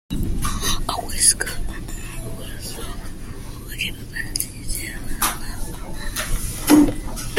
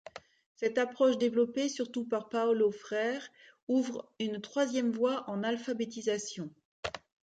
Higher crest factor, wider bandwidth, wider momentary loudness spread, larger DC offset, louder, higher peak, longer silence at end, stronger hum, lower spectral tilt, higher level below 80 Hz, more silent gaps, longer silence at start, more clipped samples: first, 22 dB vs 16 dB; first, 16.5 kHz vs 9.2 kHz; first, 18 LU vs 14 LU; neither; first, -22 LUFS vs -32 LUFS; first, 0 dBFS vs -16 dBFS; second, 0 s vs 0.35 s; neither; second, -3 dB/octave vs -4.5 dB/octave; first, -30 dBFS vs -72 dBFS; second, none vs 0.46-0.55 s, 3.63-3.67 s, 6.65-6.83 s; about the same, 0.1 s vs 0.15 s; neither